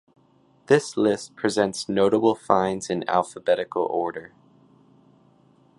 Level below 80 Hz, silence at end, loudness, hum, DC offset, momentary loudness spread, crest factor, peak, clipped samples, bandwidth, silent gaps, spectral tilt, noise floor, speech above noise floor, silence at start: -64 dBFS; 1.55 s; -23 LUFS; none; under 0.1%; 7 LU; 22 dB; -2 dBFS; under 0.1%; 11.5 kHz; none; -5 dB/octave; -60 dBFS; 37 dB; 0.7 s